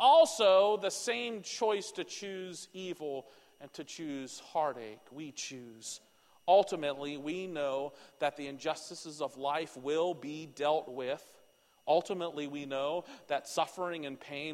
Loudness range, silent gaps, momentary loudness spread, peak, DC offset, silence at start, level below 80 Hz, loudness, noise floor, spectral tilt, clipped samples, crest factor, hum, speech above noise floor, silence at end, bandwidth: 7 LU; none; 17 LU; -14 dBFS; under 0.1%; 0 s; -82 dBFS; -34 LUFS; -66 dBFS; -3 dB/octave; under 0.1%; 20 dB; none; 32 dB; 0 s; 15 kHz